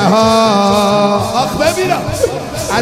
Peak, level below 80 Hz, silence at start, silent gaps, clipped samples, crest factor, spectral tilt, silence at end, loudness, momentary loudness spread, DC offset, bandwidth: 0 dBFS; -36 dBFS; 0 s; none; under 0.1%; 12 dB; -4.5 dB/octave; 0 s; -12 LUFS; 7 LU; under 0.1%; 16 kHz